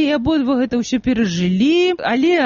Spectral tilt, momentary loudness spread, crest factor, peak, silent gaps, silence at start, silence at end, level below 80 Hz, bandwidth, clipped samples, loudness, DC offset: -4.5 dB/octave; 4 LU; 10 dB; -6 dBFS; none; 0 s; 0 s; -42 dBFS; 7.4 kHz; under 0.1%; -17 LUFS; under 0.1%